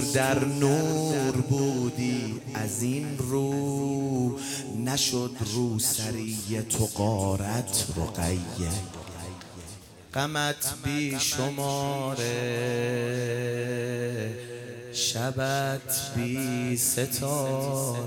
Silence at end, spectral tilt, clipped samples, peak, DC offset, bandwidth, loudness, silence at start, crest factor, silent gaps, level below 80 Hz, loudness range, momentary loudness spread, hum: 0 s; -4.5 dB/octave; under 0.1%; -12 dBFS; under 0.1%; 17.5 kHz; -28 LUFS; 0 s; 16 dB; none; -52 dBFS; 3 LU; 9 LU; none